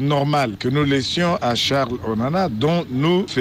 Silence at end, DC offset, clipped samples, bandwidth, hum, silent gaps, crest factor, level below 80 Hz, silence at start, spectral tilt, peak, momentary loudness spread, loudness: 0 s; under 0.1%; under 0.1%; 15.5 kHz; none; none; 12 dB; -48 dBFS; 0 s; -5.5 dB/octave; -8 dBFS; 3 LU; -20 LUFS